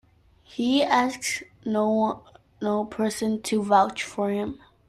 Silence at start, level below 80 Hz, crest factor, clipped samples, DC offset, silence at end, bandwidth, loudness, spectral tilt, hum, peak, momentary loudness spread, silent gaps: 0.5 s; -62 dBFS; 20 dB; under 0.1%; under 0.1%; 0.3 s; 13.5 kHz; -25 LUFS; -4 dB/octave; none; -6 dBFS; 10 LU; none